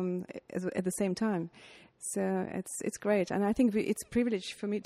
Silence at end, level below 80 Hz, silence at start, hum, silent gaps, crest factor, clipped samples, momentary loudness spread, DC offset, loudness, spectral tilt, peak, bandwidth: 0.05 s; -64 dBFS; 0 s; none; none; 16 dB; under 0.1%; 9 LU; under 0.1%; -33 LUFS; -5.5 dB/octave; -18 dBFS; 15 kHz